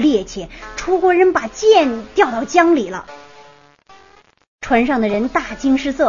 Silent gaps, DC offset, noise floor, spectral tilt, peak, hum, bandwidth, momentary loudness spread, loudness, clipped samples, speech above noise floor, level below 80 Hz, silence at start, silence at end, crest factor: 4.48-4.59 s; 0.2%; -49 dBFS; -4.5 dB/octave; 0 dBFS; none; 7.4 kHz; 17 LU; -16 LUFS; under 0.1%; 34 dB; -44 dBFS; 0 s; 0 s; 16 dB